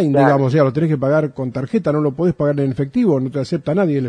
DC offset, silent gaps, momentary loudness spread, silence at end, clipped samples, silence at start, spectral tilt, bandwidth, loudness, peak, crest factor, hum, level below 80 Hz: under 0.1%; none; 7 LU; 0 s; under 0.1%; 0 s; -9 dB/octave; 9.6 kHz; -17 LUFS; 0 dBFS; 16 dB; none; -52 dBFS